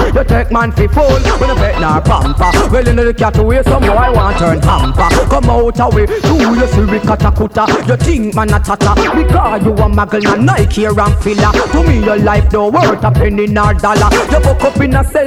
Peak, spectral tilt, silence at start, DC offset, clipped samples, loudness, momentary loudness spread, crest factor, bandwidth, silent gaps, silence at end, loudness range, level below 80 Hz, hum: 0 dBFS; -6.5 dB/octave; 0 s; under 0.1%; under 0.1%; -10 LUFS; 2 LU; 10 dB; 15 kHz; none; 0 s; 1 LU; -16 dBFS; none